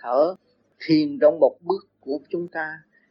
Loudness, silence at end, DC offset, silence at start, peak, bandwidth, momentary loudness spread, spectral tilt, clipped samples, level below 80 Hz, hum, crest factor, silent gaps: -23 LUFS; 0.35 s; under 0.1%; 0.05 s; -4 dBFS; 6 kHz; 16 LU; -8 dB/octave; under 0.1%; -78 dBFS; none; 18 dB; none